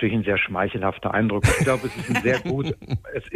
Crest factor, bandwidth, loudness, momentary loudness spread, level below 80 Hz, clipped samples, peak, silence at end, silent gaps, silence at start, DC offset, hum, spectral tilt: 16 dB; 15.5 kHz; -23 LUFS; 8 LU; -40 dBFS; under 0.1%; -6 dBFS; 0 s; none; 0 s; under 0.1%; none; -5.5 dB/octave